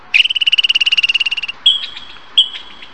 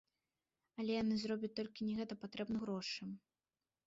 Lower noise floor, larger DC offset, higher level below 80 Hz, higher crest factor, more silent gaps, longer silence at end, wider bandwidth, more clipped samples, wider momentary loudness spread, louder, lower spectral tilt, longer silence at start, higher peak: second, -34 dBFS vs under -90 dBFS; first, 1% vs under 0.1%; first, -56 dBFS vs -76 dBFS; about the same, 16 dB vs 14 dB; neither; second, 0.1 s vs 0.7 s; first, 9.2 kHz vs 7.6 kHz; neither; about the same, 12 LU vs 10 LU; first, -12 LUFS vs -42 LUFS; second, 2 dB/octave vs -4.5 dB/octave; second, 0.15 s vs 0.75 s; first, 0 dBFS vs -30 dBFS